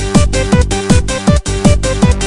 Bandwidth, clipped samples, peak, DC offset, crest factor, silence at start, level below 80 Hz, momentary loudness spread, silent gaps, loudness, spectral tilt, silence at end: 12 kHz; 0.6%; 0 dBFS; under 0.1%; 10 dB; 0 s; -16 dBFS; 1 LU; none; -12 LUFS; -5.5 dB/octave; 0 s